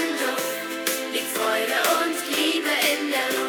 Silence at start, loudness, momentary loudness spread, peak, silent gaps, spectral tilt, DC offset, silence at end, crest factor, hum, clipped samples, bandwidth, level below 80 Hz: 0 s; -23 LUFS; 5 LU; -6 dBFS; none; -0.5 dB/octave; under 0.1%; 0 s; 18 dB; none; under 0.1%; over 20 kHz; -90 dBFS